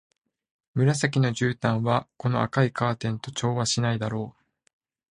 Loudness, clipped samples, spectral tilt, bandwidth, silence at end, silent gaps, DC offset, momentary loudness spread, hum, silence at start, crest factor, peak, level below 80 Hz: -26 LUFS; under 0.1%; -5.5 dB/octave; 11 kHz; 0.85 s; none; under 0.1%; 7 LU; none; 0.75 s; 20 dB; -6 dBFS; -58 dBFS